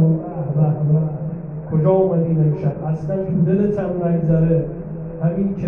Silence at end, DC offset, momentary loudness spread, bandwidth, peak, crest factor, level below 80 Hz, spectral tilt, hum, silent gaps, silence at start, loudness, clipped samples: 0 s; under 0.1%; 10 LU; 2.8 kHz; -4 dBFS; 14 dB; -42 dBFS; -12.5 dB/octave; none; none; 0 s; -19 LUFS; under 0.1%